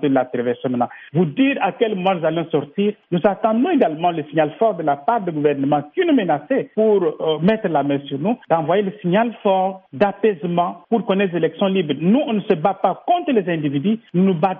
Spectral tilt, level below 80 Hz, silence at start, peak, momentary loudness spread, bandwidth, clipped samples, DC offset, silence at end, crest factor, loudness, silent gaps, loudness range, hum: -5.5 dB/octave; -62 dBFS; 0 s; -2 dBFS; 5 LU; 4.3 kHz; under 0.1%; under 0.1%; 0 s; 16 dB; -19 LUFS; none; 1 LU; none